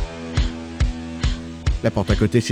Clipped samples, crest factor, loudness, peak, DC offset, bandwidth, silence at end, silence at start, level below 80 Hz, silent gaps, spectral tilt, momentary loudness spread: under 0.1%; 16 dB; -23 LUFS; -6 dBFS; under 0.1%; 11.5 kHz; 0 s; 0 s; -26 dBFS; none; -6 dB/octave; 8 LU